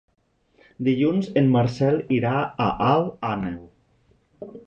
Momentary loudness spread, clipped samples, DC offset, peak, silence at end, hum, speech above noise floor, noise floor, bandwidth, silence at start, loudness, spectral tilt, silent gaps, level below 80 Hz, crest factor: 12 LU; under 0.1%; under 0.1%; -6 dBFS; 0.05 s; none; 40 dB; -62 dBFS; 8 kHz; 0.8 s; -22 LUFS; -8.5 dB/octave; none; -54 dBFS; 18 dB